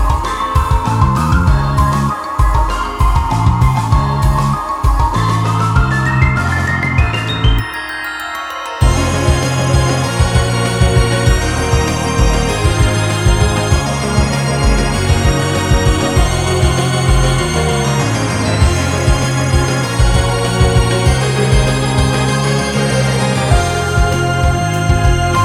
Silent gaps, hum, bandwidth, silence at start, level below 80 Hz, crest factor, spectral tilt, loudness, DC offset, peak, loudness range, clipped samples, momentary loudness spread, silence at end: none; none; 15.5 kHz; 0 s; -18 dBFS; 12 dB; -5 dB/octave; -14 LUFS; under 0.1%; 0 dBFS; 2 LU; under 0.1%; 3 LU; 0 s